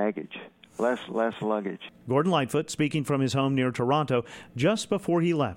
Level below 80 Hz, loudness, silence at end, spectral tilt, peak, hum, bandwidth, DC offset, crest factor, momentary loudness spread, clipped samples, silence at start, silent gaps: -64 dBFS; -27 LUFS; 0 s; -6 dB/octave; -12 dBFS; none; 16.5 kHz; under 0.1%; 16 dB; 13 LU; under 0.1%; 0 s; none